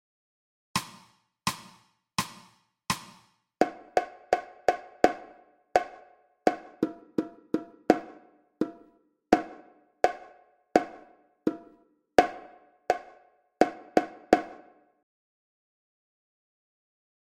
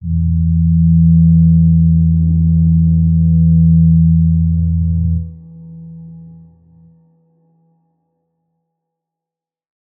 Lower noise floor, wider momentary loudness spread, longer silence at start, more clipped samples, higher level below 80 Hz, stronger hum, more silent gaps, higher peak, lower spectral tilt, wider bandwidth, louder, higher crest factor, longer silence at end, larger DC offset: second, -63 dBFS vs -87 dBFS; first, 16 LU vs 8 LU; first, 0.75 s vs 0 s; neither; second, -62 dBFS vs -28 dBFS; neither; neither; about the same, -2 dBFS vs -2 dBFS; second, -4.5 dB/octave vs -20 dB/octave; first, 16 kHz vs 0.5 kHz; second, -30 LUFS vs -12 LUFS; first, 30 dB vs 10 dB; second, 2.8 s vs 3.7 s; neither